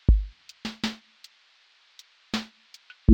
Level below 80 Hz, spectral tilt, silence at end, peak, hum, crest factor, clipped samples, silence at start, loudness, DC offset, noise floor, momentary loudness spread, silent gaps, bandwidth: -30 dBFS; -6.5 dB/octave; 0 s; -6 dBFS; none; 22 dB; under 0.1%; 0.1 s; -31 LUFS; under 0.1%; -61 dBFS; 25 LU; none; 8.8 kHz